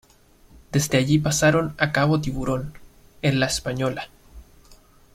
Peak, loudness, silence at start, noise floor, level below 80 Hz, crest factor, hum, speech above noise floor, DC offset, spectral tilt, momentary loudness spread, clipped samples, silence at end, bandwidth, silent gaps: -4 dBFS; -22 LUFS; 0.7 s; -54 dBFS; -44 dBFS; 20 dB; none; 32 dB; under 0.1%; -5 dB/octave; 10 LU; under 0.1%; 0.4 s; 15.5 kHz; none